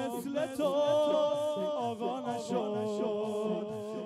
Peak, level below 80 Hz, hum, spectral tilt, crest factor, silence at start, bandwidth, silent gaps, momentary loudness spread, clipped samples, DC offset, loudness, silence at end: -20 dBFS; -76 dBFS; none; -5.5 dB/octave; 12 dB; 0 s; 14.5 kHz; none; 7 LU; under 0.1%; under 0.1%; -32 LUFS; 0 s